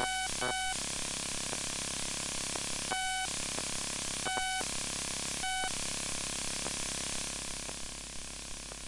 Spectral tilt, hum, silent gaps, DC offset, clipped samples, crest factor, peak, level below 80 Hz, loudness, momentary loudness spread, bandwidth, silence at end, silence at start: -1 dB/octave; 50 Hz at -55 dBFS; none; under 0.1%; under 0.1%; 20 dB; -16 dBFS; -52 dBFS; -34 LUFS; 6 LU; 11.5 kHz; 0 s; 0 s